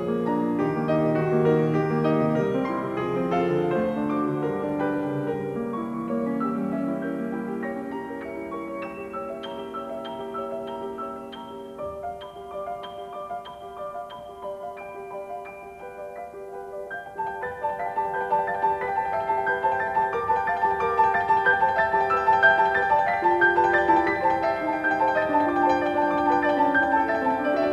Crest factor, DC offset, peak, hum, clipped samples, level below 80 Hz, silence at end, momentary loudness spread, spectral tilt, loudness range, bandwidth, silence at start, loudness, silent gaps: 18 dB; under 0.1%; -6 dBFS; none; under 0.1%; -56 dBFS; 0 s; 16 LU; -7.5 dB/octave; 15 LU; 13 kHz; 0 s; -24 LUFS; none